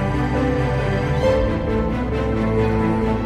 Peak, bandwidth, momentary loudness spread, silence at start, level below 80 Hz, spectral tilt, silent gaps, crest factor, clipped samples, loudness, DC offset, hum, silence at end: -6 dBFS; 11 kHz; 3 LU; 0 s; -28 dBFS; -8 dB/octave; none; 12 dB; under 0.1%; -20 LUFS; under 0.1%; none; 0 s